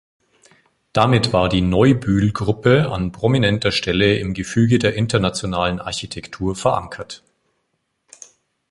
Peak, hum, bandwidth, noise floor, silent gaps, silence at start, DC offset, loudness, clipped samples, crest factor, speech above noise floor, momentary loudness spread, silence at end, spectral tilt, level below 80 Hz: 0 dBFS; none; 11.5 kHz; -71 dBFS; none; 0.95 s; under 0.1%; -18 LUFS; under 0.1%; 18 dB; 54 dB; 11 LU; 1.55 s; -6 dB/octave; -40 dBFS